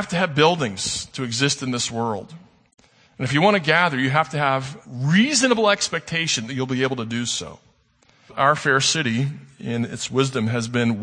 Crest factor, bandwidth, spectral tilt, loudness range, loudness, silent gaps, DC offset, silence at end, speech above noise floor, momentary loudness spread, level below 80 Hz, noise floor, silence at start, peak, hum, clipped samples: 20 dB; 9.8 kHz; -4 dB/octave; 4 LU; -21 LUFS; none; under 0.1%; 0 s; 38 dB; 10 LU; -58 dBFS; -59 dBFS; 0 s; -2 dBFS; none; under 0.1%